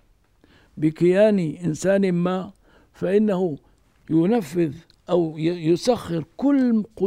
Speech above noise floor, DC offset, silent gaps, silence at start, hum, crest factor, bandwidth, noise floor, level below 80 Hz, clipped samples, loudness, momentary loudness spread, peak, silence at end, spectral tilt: 38 dB; under 0.1%; none; 0.75 s; none; 16 dB; 15 kHz; -59 dBFS; -58 dBFS; under 0.1%; -22 LUFS; 9 LU; -6 dBFS; 0 s; -7 dB/octave